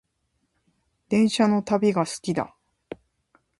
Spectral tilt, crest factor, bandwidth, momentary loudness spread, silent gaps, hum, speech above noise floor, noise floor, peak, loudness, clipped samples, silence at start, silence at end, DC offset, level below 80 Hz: -5.5 dB/octave; 18 dB; 11.5 kHz; 23 LU; none; none; 52 dB; -74 dBFS; -8 dBFS; -23 LUFS; under 0.1%; 1.1 s; 1.15 s; under 0.1%; -64 dBFS